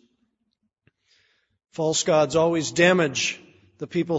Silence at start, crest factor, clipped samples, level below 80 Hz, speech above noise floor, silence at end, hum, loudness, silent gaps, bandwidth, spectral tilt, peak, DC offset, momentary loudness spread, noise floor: 1.8 s; 22 dB; under 0.1%; -62 dBFS; 54 dB; 0 s; none; -22 LUFS; none; 8 kHz; -4 dB/octave; -4 dBFS; under 0.1%; 19 LU; -75 dBFS